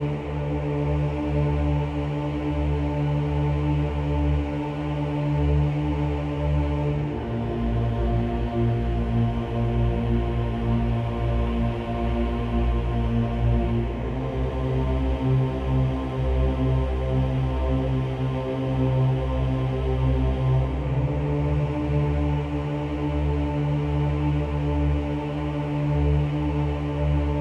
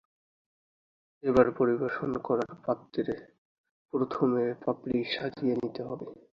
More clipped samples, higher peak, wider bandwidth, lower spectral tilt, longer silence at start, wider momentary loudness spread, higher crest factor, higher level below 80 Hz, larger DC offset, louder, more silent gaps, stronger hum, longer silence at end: neither; second, -12 dBFS vs -8 dBFS; about the same, 6.6 kHz vs 7 kHz; first, -9.5 dB/octave vs -7.5 dB/octave; second, 0 s vs 1.25 s; second, 4 LU vs 11 LU; second, 12 dB vs 22 dB; first, -28 dBFS vs -62 dBFS; neither; first, -25 LUFS vs -30 LUFS; second, none vs 3.38-3.64 s, 3.71-3.89 s; neither; second, 0 s vs 0.25 s